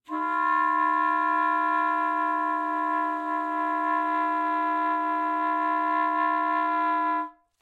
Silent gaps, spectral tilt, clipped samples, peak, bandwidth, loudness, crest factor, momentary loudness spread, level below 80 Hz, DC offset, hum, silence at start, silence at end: none; -3 dB/octave; under 0.1%; -14 dBFS; 7.8 kHz; -25 LUFS; 12 dB; 4 LU; -86 dBFS; under 0.1%; none; 0.1 s; 0.3 s